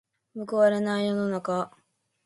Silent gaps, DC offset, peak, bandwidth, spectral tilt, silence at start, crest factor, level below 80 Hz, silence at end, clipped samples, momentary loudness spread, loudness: none; under 0.1%; -10 dBFS; 11.5 kHz; -6.5 dB/octave; 0.35 s; 18 dB; -74 dBFS; 0.55 s; under 0.1%; 16 LU; -26 LUFS